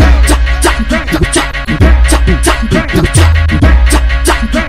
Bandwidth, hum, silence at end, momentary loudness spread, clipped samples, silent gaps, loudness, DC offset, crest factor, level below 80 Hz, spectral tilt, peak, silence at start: 15 kHz; none; 0 s; 4 LU; 1%; none; -9 LUFS; under 0.1%; 8 dB; -10 dBFS; -5 dB/octave; 0 dBFS; 0 s